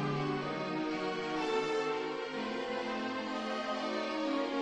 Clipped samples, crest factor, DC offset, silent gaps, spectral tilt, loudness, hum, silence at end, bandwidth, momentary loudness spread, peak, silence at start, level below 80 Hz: under 0.1%; 14 dB; under 0.1%; none; -5.5 dB/octave; -35 LUFS; none; 0 s; 10 kHz; 4 LU; -20 dBFS; 0 s; -68 dBFS